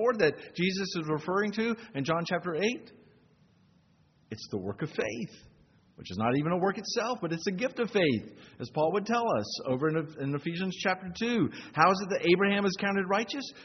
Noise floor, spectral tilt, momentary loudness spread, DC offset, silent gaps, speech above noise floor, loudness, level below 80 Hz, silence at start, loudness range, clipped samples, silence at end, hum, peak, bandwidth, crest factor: -65 dBFS; -4 dB/octave; 11 LU; under 0.1%; none; 35 dB; -30 LUFS; -68 dBFS; 0 s; 8 LU; under 0.1%; 0 s; none; -8 dBFS; 6.4 kHz; 22 dB